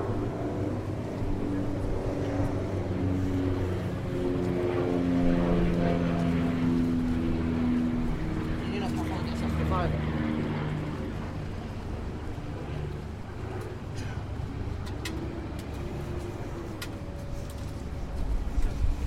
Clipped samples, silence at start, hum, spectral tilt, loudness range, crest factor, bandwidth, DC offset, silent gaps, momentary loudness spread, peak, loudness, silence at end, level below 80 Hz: under 0.1%; 0 s; none; -7.5 dB/octave; 9 LU; 16 dB; 15 kHz; under 0.1%; none; 10 LU; -14 dBFS; -31 LUFS; 0 s; -36 dBFS